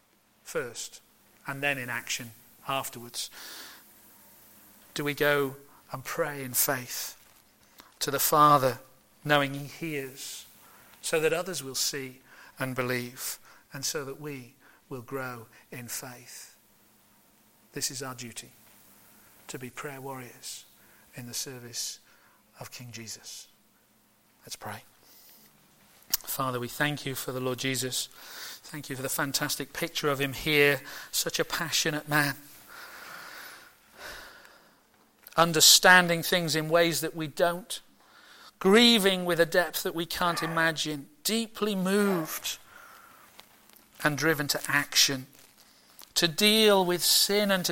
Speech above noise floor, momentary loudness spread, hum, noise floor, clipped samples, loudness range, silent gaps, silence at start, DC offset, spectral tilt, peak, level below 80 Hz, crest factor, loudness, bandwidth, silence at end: 37 dB; 22 LU; none; -65 dBFS; under 0.1%; 17 LU; none; 0.45 s; under 0.1%; -2.5 dB/octave; -4 dBFS; -64 dBFS; 26 dB; -26 LUFS; 17 kHz; 0 s